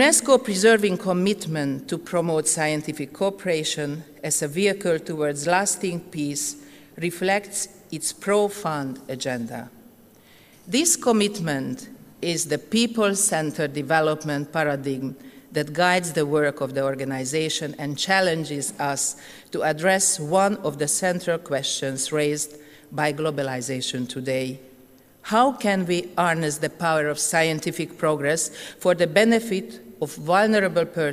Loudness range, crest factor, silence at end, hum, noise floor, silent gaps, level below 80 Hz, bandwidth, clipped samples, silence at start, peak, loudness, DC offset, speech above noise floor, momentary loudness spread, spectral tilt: 4 LU; 20 dB; 0 s; none; -52 dBFS; none; -64 dBFS; 15.5 kHz; under 0.1%; 0 s; -4 dBFS; -23 LUFS; under 0.1%; 29 dB; 11 LU; -3.5 dB/octave